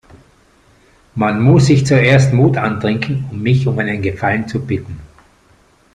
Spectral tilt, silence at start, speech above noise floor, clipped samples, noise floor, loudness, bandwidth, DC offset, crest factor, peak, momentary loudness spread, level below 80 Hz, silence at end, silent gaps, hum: -7 dB/octave; 1.15 s; 38 dB; under 0.1%; -51 dBFS; -14 LUFS; 9.8 kHz; under 0.1%; 14 dB; 0 dBFS; 12 LU; -44 dBFS; 0.9 s; none; none